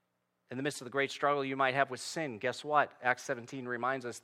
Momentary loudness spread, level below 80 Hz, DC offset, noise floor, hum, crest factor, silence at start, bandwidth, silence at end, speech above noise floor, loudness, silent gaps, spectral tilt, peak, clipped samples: 9 LU; -86 dBFS; under 0.1%; -79 dBFS; none; 22 dB; 0.5 s; 16 kHz; 0.05 s; 45 dB; -33 LUFS; none; -4 dB/octave; -12 dBFS; under 0.1%